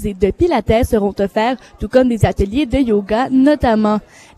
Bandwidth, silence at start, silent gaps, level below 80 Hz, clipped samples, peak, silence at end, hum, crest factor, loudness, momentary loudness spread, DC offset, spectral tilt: 14 kHz; 0 s; none; -30 dBFS; under 0.1%; 0 dBFS; 0.4 s; none; 14 dB; -15 LUFS; 5 LU; under 0.1%; -7 dB/octave